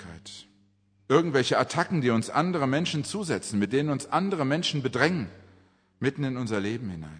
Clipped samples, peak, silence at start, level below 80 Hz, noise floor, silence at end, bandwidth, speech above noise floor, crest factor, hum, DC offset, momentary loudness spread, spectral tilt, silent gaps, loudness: under 0.1%; -6 dBFS; 0 s; -64 dBFS; -65 dBFS; 0 s; 10.5 kHz; 38 dB; 22 dB; none; under 0.1%; 9 LU; -5.5 dB/octave; none; -27 LUFS